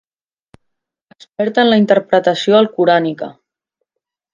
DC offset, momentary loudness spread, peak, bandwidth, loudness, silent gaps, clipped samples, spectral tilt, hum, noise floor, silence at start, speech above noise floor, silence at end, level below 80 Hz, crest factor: under 0.1%; 15 LU; 0 dBFS; 7.4 kHz; -13 LUFS; none; under 0.1%; -6 dB/octave; none; -85 dBFS; 1.4 s; 72 dB; 1 s; -64 dBFS; 16 dB